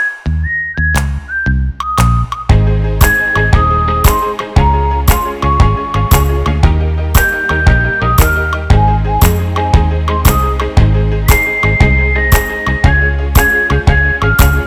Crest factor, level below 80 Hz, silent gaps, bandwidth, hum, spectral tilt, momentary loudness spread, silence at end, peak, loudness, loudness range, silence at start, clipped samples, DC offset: 10 dB; -14 dBFS; none; over 20 kHz; none; -5.5 dB/octave; 5 LU; 0 s; 0 dBFS; -12 LUFS; 1 LU; 0 s; 0.8%; under 0.1%